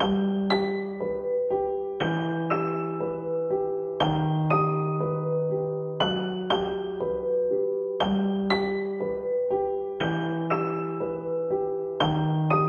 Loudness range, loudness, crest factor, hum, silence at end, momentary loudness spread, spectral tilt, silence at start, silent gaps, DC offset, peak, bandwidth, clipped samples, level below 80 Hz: 2 LU; -27 LUFS; 18 dB; none; 0 s; 5 LU; -8 dB/octave; 0 s; none; under 0.1%; -8 dBFS; 6.8 kHz; under 0.1%; -56 dBFS